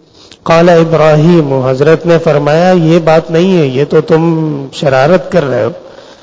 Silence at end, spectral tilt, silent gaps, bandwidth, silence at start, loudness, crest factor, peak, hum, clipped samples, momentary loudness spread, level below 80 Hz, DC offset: 0.2 s; -7.5 dB/octave; none; 8 kHz; 0.45 s; -8 LUFS; 8 dB; 0 dBFS; none; 2%; 7 LU; -42 dBFS; under 0.1%